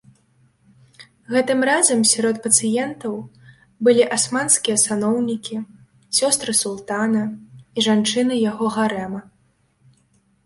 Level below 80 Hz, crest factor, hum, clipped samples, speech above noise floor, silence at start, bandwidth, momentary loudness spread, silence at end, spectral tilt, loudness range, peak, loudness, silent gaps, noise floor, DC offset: -64 dBFS; 20 dB; none; under 0.1%; 43 dB; 1 s; 12 kHz; 14 LU; 1.25 s; -2.5 dB/octave; 4 LU; 0 dBFS; -18 LUFS; none; -62 dBFS; under 0.1%